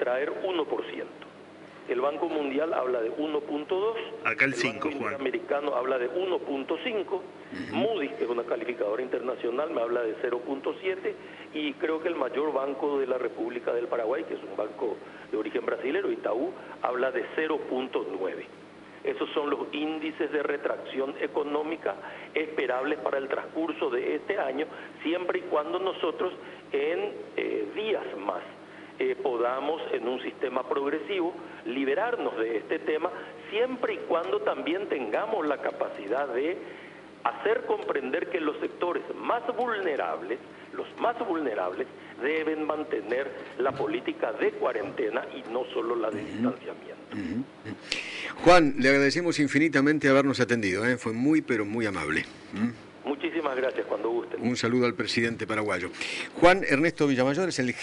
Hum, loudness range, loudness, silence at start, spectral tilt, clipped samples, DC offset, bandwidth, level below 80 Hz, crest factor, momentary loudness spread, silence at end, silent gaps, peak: 50 Hz at -60 dBFS; 6 LU; -29 LUFS; 0 s; -5 dB/octave; under 0.1%; under 0.1%; 11 kHz; -60 dBFS; 20 dB; 10 LU; 0 s; none; -8 dBFS